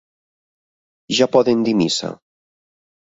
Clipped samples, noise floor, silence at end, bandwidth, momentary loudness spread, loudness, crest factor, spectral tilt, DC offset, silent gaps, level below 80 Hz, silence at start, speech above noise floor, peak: under 0.1%; under -90 dBFS; 0.9 s; 8 kHz; 8 LU; -17 LUFS; 20 dB; -4.5 dB/octave; under 0.1%; none; -62 dBFS; 1.1 s; over 73 dB; -2 dBFS